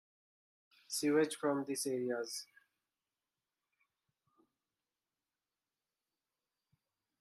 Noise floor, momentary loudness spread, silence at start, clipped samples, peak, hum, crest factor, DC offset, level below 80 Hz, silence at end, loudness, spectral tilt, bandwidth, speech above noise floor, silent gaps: under -90 dBFS; 10 LU; 0.9 s; under 0.1%; -20 dBFS; none; 22 dB; under 0.1%; -88 dBFS; 4.75 s; -37 LUFS; -3.5 dB/octave; 14 kHz; over 54 dB; none